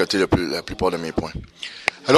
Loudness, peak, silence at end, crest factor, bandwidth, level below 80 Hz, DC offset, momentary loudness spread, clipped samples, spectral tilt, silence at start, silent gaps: -23 LUFS; 0 dBFS; 0 s; 22 dB; 14 kHz; -40 dBFS; under 0.1%; 14 LU; under 0.1%; -5 dB/octave; 0 s; none